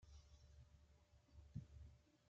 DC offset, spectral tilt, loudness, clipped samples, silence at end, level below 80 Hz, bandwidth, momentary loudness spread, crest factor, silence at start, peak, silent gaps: under 0.1%; -7.5 dB/octave; -63 LUFS; under 0.1%; 0 s; -68 dBFS; 7.4 kHz; 11 LU; 24 dB; 0 s; -38 dBFS; none